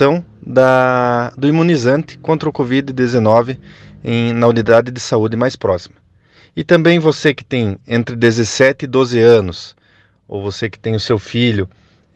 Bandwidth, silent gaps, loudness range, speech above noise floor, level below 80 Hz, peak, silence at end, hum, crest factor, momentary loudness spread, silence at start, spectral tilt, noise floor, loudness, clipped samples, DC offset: 9 kHz; none; 2 LU; 39 dB; -52 dBFS; 0 dBFS; 0.5 s; none; 14 dB; 13 LU; 0 s; -6 dB/octave; -53 dBFS; -14 LUFS; under 0.1%; under 0.1%